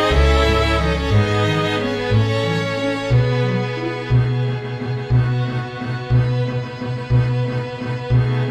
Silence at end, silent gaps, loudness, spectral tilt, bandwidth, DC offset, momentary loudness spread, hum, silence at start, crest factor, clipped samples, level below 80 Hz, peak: 0 s; none; -19 LUFS; -7 dB/octave; 9.4 kHz; under 0.1%; 9 LU; none; 0 s; 16 dB; under 0.1%; -28 dBFS; -2 dBFS